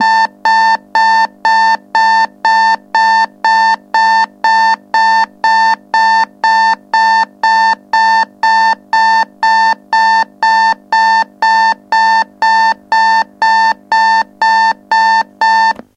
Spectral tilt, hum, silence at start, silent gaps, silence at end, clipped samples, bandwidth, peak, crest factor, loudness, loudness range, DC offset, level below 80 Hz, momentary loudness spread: -1 dB/octave; none; 0 s; none; 0.25 s; under 0.1%; 9.6 kHz; 0 dBFS; 10 dB; -10 LUFS; 0 LU; under 0.1%; -66 dBFS; 2 LU